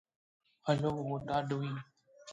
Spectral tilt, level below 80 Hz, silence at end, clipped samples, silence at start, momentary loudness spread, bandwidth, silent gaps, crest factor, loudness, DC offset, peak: -7 dB/octave; -64 dBFS; 0 s; under 0.1%; 0.65 s; 11 LU; 9.2 kHz; none; 20 dB; -36 LUFS; under 0.1%; -16 dBFS